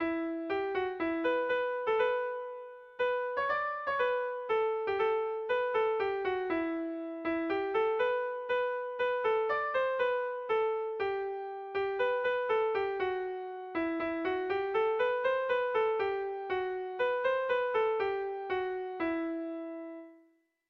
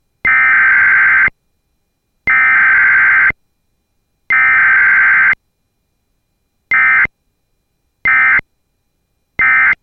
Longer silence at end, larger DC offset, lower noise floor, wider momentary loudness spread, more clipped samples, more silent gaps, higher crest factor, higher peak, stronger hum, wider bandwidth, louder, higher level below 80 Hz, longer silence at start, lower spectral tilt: first, 0.55 s vs 0.1 s; neither; about the same, -68 dBFS vs -65 dBFS; about the same, 7 LU vs 7 LU; neither; neither; about the same, 14 dB vs 10 dB; second, -18 dBFS vs -2 dBFS; neither; about the same, 6 kHz vs 6.2 kHz; second, -32 LUFS vs -9 LUFS; second, -68 dBFS vs -46 dBFS; second, 0 s vs 0.25 s; first, -6 dB/octave vs -4.5 dB/octave